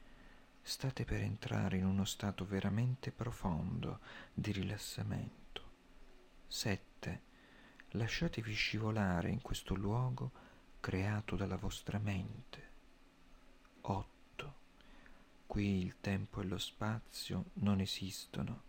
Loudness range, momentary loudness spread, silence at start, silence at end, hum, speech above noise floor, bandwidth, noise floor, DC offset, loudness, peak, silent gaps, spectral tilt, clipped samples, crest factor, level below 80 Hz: 6 LU; 14 LU; 0 s; 0 s; none; 24 dB; 17 kHz; -63 dBFS; under 0.1%; -40 LUFS; -24 dBFS; none; -5.5 dB/octave; under 0.1%; 18 dB; -54 dBFS